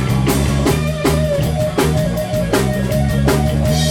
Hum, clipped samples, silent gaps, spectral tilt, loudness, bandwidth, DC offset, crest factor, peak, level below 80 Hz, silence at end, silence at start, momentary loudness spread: none; under 0.1%; none; -6 dB/octave; -16 LUFS; 18 kHz; under 0.1%; 14 dB; -2 dBFS; -24 dBFS; 0 s; 0 s; 2 LU